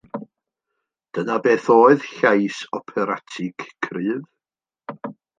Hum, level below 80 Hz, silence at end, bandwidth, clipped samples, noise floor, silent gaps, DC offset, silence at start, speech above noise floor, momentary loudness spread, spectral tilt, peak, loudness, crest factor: none; -72 dBFS; 0.25 s; 9 kHz; under 0.1%; under -90 dBFS; none; under 0.1%; 0.15 s; over 71 dB; 21 LU; -6 dB/octave; -2 dBFS; -20 LUFS; 20 dB